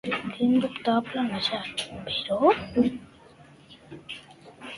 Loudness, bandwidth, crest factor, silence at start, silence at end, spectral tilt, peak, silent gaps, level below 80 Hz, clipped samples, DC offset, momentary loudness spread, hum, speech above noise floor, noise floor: -26 LUFS; 11.5 kHz; 20 dB; 0.05 s; 0 s; -5 dB/octave; -8 dBFS; none; -58 dBFS; under 0.1%; under 0.1%; 19 LU; none; 26 dB; -52 dBFS